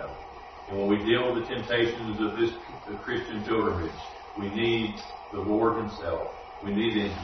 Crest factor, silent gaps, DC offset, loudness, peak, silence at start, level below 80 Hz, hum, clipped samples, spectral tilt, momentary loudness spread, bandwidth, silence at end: 18 dB; none; under 0.1%; -29 LUFS; -12 dBFS; 0 s; -52 dBFS; none; under 0.1%; -6.5 dB/octave; 14 LU; 6.4 kHz; 0 s